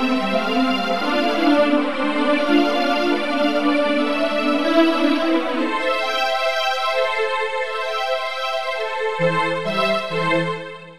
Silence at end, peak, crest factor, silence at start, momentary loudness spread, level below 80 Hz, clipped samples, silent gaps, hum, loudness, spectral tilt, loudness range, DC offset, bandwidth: 0 s; -4 dBFS; 16 dB; 0 s; 6 LU; -62 dBFS; under 0.1%; none; none; -19 LUFS; -5 dB/octave; 3 LU; 2%; 14 kHz